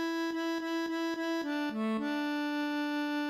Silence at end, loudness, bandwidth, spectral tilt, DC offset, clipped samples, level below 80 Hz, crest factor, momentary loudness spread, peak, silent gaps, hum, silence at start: 0 s; -34 LUFS; 15.5 kHz; -4.5 dB/octave; under 0.1%; under 0.1%; -80 dBFS; 12 dB; 1 LU; -22 dBFS; none; none; 0 s